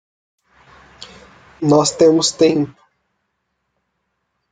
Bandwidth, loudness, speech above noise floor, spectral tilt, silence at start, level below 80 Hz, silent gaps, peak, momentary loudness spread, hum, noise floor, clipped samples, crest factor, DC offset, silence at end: 9.6 kHz; -15 LUFS; 58 dB; -4.5 dB/octave; 1.6 s; -58 dBFS; none; -2 dBFS; 19 LU; none; -72 dBFS; under 0.1%; 18 dB; under 0.1%; 1.8 s